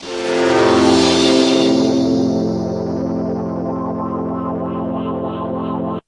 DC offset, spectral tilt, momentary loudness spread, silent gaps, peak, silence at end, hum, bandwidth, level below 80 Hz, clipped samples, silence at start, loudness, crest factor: under 0.1%; -5 dB/octave; 10 LU; none; 0 dBFS; 0.05 s; none; 11.5 kHz; -52 dBFS; under 0.1%; 0 s; -17 LUFS; 16 dB